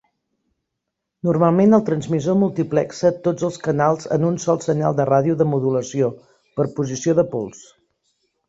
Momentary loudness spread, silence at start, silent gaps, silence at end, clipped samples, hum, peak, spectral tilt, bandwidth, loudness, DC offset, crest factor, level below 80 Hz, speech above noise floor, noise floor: 8 LU; 1.25 s; none; 0.85 s; under 0.1%; none; -2 dBFS; -7.5 dB/octave; 8 kHz; -19 LUFS; under 0.1%; 18 dB; -58 dBFS; 61 dB; -80 dBFS